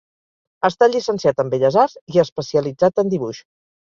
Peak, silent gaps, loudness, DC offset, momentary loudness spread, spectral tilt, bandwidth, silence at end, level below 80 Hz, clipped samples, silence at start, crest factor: -2 dBFS; 2.01-2.07 s, 2.32-2.36 s; -18 LUFS; under 0.1%; 6 LU; -6 dB/octave; 7.4 kHz; 0.45 s; -60 dBFS; under 0.1%; 0.65 s; 18 dB